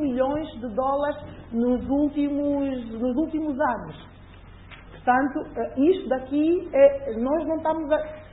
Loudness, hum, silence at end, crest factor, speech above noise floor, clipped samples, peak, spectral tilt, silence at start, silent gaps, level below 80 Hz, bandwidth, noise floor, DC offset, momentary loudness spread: -24 LUFS; none; 0.05 s; 18 dB; 22 dB; under 0.1%; -6 dBFS; -11 dB/octave; 0 s; none; -48 dBFS; 4 kHz; -45 dBFS; under 0.1%; 9 LU